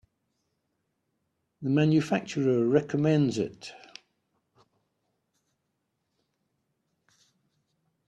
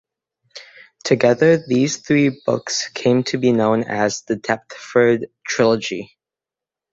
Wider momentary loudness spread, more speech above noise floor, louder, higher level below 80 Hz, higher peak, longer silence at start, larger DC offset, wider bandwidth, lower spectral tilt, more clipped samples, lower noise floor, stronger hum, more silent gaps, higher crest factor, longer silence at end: first, 17 LU vs 9 LU; second, 54 dB vs 70 dB; second, -26 LUFS vs -18 LUFS; second, -70 dBFS vs -58 dBFS; second, -10 dBFS vs -2 dBFS; first, 1.6 s vs 0.55 s; neither; first, 9.6 kHz vs 8 kHz; first, -7 dB/octave vs -5 dB/octave; neither; second, -80 dBFS vs -88 dBFS; neither; neither; about the same, 22 dB vs 18 dB; first, 4.3 s vs 0.9 s